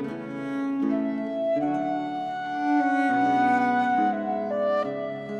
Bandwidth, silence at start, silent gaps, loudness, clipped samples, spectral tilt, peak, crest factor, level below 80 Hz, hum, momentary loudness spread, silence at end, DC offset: 8.6 kHz; 0 s; none; -25 LUFS; under 0.1%; -7 dB/octave; -12 dBFS; 12 dB; -70 dBFS; none; 9 LU; 0 s; under 0.1%